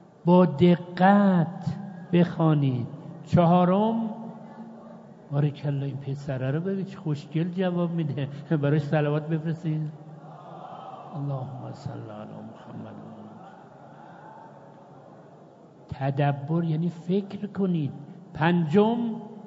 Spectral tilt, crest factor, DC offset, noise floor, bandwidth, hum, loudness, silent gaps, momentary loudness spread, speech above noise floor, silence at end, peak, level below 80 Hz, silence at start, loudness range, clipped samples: -9.5 dB/octave; 20 dB; under 0.1%; -50 dBFS; 7.4 kHz; none; -25 LUFS; none; 23 LU; 26 dB; 0 s; -6 dBFS; -64 dBFS; 0.25 s; 17 LU; under 0.1%